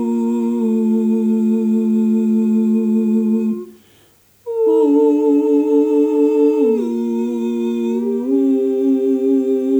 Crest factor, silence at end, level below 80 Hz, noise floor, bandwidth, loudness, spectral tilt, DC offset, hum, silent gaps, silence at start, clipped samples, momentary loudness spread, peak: 10 dB; 0 s; -70 dBFS; -52 dBFS; over 20 kHz; -16 LUFS; -9 dB/octave; under 0.1%; none; none; 0 s; under 0.1%; 6 LU; -4 dBFS